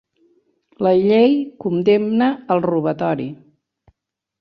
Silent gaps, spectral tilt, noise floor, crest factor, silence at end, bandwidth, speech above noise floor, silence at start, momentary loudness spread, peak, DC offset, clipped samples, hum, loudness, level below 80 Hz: none; -9 dB/octave; -75 dBFS; 16 dB; 1.05 s; 6 kHz; 58 dB; 0.8 s; 8 LU; -4 dBFS; under 0.1%; under 0.1%; none; -17 LUFS; -62 dBFS